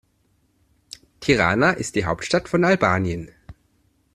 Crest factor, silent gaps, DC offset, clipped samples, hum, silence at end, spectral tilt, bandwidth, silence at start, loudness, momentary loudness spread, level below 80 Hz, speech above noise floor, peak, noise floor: 20 dB; none; under 0.1%; under 0.1%; none; 0.6 s; -5.5 dB/octave; 13 kHz; 1.2 s; -20 LUFS; 24 LU; -48 dBFS; 45 dB; -2 dBFS; -65 dBFS